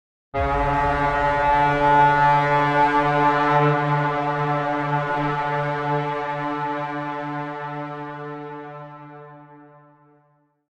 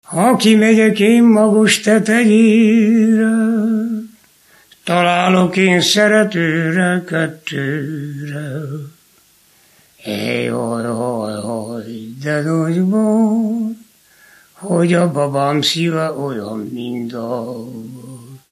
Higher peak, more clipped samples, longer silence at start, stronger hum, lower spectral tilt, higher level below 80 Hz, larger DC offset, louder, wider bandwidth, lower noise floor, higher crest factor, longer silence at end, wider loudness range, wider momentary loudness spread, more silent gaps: second, -6 dBFS vs 0 dBFS; neither; first, 0.35 s vs 0.1 s; neither; first, -7 dB/octave vs -5.5 dB/octave; first, -40 dBFS vs -66 dBFS; neither; second, -21 LUFS vs -15 LUFS; second, 9.2 kHz vs 13 kHz; first, -63 dBFS vs -52 dBFS; about the same, 16 dB vs 16 dB; first, 1.05 s vs 0.15 s; first, 15 LU vs 11 LU; about the same, 16 LU vs 16 LU; neither